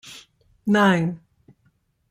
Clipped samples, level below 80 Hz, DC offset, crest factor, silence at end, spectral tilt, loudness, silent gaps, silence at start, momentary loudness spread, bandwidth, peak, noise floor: under 0.1%; -62 dBFS; under 0.1%; 18 dB; 0.95 s; -6.5 dB/octave; -21 LUFS; none; 0.05 s; 24 LU; 14 kHz; -6 dBFS; -66 dBFS